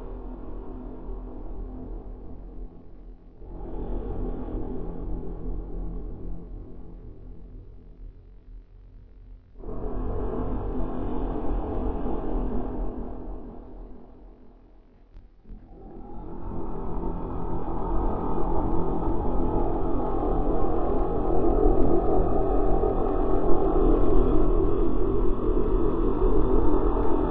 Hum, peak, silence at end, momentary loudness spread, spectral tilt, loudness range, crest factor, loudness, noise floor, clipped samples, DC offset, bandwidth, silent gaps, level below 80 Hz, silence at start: none; -6 dBFS; 0 s; 22 LU; -12.5 dB/octave; 17 LU; 18 dB; -28 LUFS; -52 dBFS; under 0.1%; under 0.1%; 3.6 kHz; none; -30 dBFS; 0 s